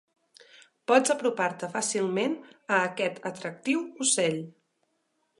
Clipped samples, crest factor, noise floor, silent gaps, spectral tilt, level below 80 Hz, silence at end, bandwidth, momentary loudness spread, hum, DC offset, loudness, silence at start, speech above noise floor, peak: under 0.1%; 22 dB; -75 dBFS; none; -3 dB/octave; -80 dBFS; 0.9 s; 11.5 kHz; 12 LU; none; under 0.1%; -27 LUFS; 0.9 s; 48 dB; -6 dBFS